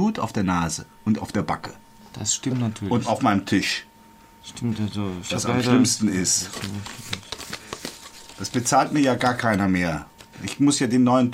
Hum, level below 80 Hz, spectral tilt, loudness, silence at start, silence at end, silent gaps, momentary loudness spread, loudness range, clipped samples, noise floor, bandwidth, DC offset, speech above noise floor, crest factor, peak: none; -52 dBFS; -4.5 dB/octave; -23 LUFS; 0 s; 0 s; none; 15 LU; 2 LU; under 0.1%; -50 dBFS; 16 kHz; under 0.1%; 28 dB; 18 dB; -6 dBFS